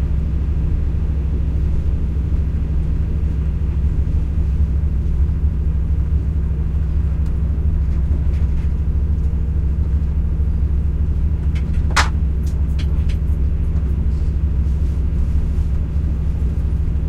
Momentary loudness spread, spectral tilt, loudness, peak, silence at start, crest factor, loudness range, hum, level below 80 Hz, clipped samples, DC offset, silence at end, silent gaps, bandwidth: 2 LU; -7 dB/octave; -20 LUFS; 0 dBFS; 0 s; 16 dB; 1 LU; none; -18 dBFS; under 0.1%; under 0.1%; 0 s; none; 8.6 kHz